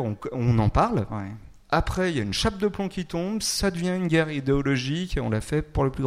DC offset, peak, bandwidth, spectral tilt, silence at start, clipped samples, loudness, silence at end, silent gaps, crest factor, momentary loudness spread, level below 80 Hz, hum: under 0.1%; -8 dBFS; 16 kHz; -5.5 dB/octave; 0 s; under 0.1%; -25 LUFS; 0 s; none; 18 dB; 7 LU; -38 dBFS; none